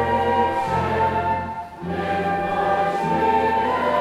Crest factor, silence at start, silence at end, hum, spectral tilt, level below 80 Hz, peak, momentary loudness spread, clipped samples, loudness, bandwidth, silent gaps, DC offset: 14 dB; 0 s; 0 s; none; -6.5 dB/octave; -46 dBFS; -8 dBFS; 7 LU; under 0.1%; -21 LUFS; 13.5 kHz; none; under 0.1%